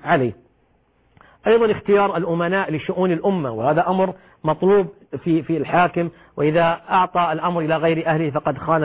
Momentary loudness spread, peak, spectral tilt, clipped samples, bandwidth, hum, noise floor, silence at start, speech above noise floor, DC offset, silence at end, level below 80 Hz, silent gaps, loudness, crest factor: 7 LU; -6 dBFS; -11 dB/octave; under 0.1%; 4 kHz; none; -61 dBFS; 0.05 s; 42 dB; under 0.1%; 0 s; -54 dBFS; none; -20 LUFS; 14 dB